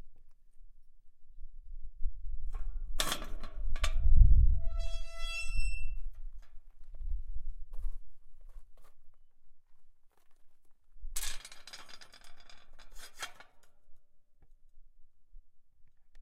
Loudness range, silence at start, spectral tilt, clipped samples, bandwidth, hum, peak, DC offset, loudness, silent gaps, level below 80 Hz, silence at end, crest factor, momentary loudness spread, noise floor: 20 LU; 0.05 s; -3.5 dB/octave; under 0.1%; 14 kHz; none; -8 dBFS; under 0.1%; -37 LUFS; none; -34 dBFS; 0 s; 22 dB; 26 LU; -55 dBFS